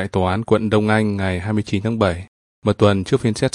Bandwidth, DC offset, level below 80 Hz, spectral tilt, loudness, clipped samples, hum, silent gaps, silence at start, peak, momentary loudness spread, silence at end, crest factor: 11 kHz; under 0.1%; -48 dBFS; -6.5 dB/octave; -19 LUFS; under 0.1%; none; 2.28-2.62 s; 0 s; 0 dBFS; 6 LU; 0.05 s; 18 dB